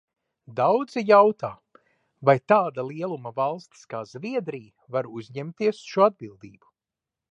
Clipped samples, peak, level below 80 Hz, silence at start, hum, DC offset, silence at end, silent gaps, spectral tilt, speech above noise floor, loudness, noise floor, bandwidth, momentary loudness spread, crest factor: under 0.1%; -4 dBFS; -74 dBFS; 0.5 s; none; under 0.1%; 0.85 s; none; -7 dB/octave; 65 dB; -24 LUFS; -89 dBFS; 8.8 kHz; 18 LU; 22 dB